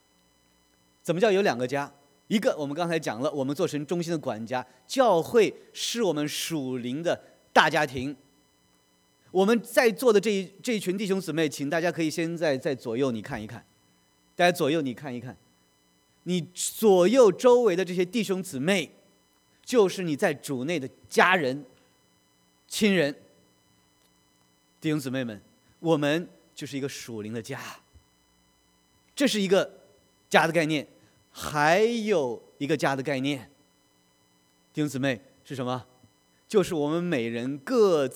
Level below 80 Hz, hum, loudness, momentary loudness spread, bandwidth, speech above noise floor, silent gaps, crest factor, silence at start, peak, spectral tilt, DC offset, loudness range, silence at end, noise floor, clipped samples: -68 dBFS; none; -26 LUFS; 15 LU; over 20 kHz; 40 dB; none; 24 dB; 1.05 s; -2 dBFS; -4.5 dB/octave; under 0.1%; 8 LU; 0 s; -65 dBFS; under 0.1%